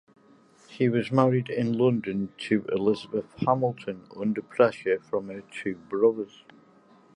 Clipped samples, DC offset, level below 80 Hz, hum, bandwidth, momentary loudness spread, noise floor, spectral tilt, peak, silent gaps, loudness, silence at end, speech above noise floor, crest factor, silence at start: under 0.1%; under 0.1%; -66 dBFS; none; 11 kHz; 11 LU; -57 dBFS; -8 dB/octave; -6 dBFS; none; -27 LUFS; 0.9 s; 31 dB; 22 dB; 0.7 s